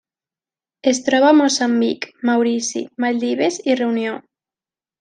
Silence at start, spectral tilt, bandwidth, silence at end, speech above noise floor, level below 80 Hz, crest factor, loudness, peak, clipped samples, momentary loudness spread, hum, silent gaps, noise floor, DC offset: 0.85 s; -3 dB/octave; 10 kHz; 0.8 s; over 73 dB; -70 dBFS; 16 dB; -18 LUFS; -2 dBFS; under 0.1%; 10 LU; none; none; under -90 dBFS; under 0.1%